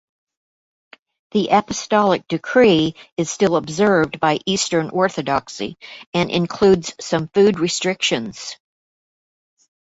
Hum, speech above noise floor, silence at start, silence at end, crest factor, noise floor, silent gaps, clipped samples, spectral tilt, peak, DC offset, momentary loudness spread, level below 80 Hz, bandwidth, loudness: none; over 72 dB; 1.35 s; 1.25 s; 18 dB; under -90 dBFS; 3.12-3.17 s, 6.06-6.13 s; under 0.1%; -4.5 dB/octave; -2 dBFS; under 0.1%; 10 LU; -54 dBFS; 8 kHz; -18 LUFS